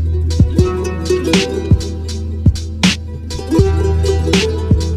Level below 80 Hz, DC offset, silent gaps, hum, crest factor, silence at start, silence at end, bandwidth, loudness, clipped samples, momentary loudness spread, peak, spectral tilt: -22 dBFS; under 0.1%; none; none; 14 dB; 0 s; 0 s; 12.5 kHz; -15 LUFS; under 0.1%; 9 LU; 0 dBFS; -6 dB/octave